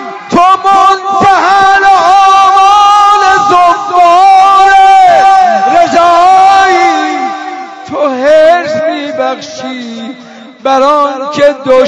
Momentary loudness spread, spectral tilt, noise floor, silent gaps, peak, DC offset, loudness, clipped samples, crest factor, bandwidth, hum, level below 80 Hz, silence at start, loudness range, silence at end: 15 LU; -3 dB/octave; -30 dBFS; none; 0 dBFS; under 0.1%; -6 LUFS; 10%; 6 dB; 11 kHz; none; -44 dBFS; 0 s; 7 LU; 0 s